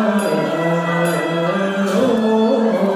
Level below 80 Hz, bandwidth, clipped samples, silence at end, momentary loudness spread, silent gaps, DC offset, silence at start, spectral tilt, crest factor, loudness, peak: -64 dBFS; 15.5 kHz; under 0.1%; 0 s; 3 LU; none; under 0.1%; 0 s; -6 dB/octave; 12 dB; -17 LUFS; -4 dBFS